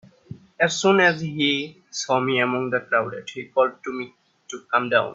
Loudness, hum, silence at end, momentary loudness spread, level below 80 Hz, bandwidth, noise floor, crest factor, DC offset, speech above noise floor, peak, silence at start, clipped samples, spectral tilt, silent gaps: -22 LUFS; none; 0 s; 15 LU; -66 dBFS; 7.8 kHz; -43 dBFS; 20 dB; under 0.1%; 21 dB; -4 dBFS; 0.3 s; under 0.1%; -4 dB/octave; none